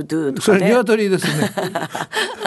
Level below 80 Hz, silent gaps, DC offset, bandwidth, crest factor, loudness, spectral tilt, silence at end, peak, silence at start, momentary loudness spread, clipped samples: -62 dBFS; none; under 0.1%; 12.5 kHz; 16 dB; -18 LUFS; -5 dB/octave; 0 s; -2 dBFS; 0 s; 9 LU; under 0.1%